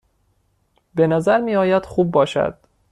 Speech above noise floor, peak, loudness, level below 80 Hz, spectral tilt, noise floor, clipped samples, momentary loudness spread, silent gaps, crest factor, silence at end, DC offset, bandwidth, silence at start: 47 dB; -4 dBFS; -18 LUFS; -52 dBFS; -7 dB/octave; -64 dBFS; under 0.1%; 6 LU; none; 16 dB; 0.4 s; under 0.1%; 11.5 kHz; 0.95 s